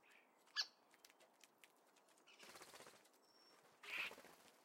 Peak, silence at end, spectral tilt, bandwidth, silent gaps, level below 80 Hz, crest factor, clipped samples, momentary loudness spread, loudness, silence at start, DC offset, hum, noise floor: -30 dBFS; 0 s; 0.5 dB/octave; 16 kHz; none; under -90 dBFS; 26 dB; under 0.1%; 23 LU; -51 LUFS; 0 s; under 0.1%; none; -74 dBFS